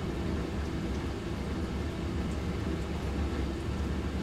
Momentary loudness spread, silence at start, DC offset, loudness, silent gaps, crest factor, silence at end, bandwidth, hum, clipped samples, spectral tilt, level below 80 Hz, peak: 1 LU; 0 s; under 0.1%; -34 LUFS; none; 12 dB; 0 s; 13 kHz; none; under 0.1%; -7 dB/octave; -38 dBFS; -20 dBFS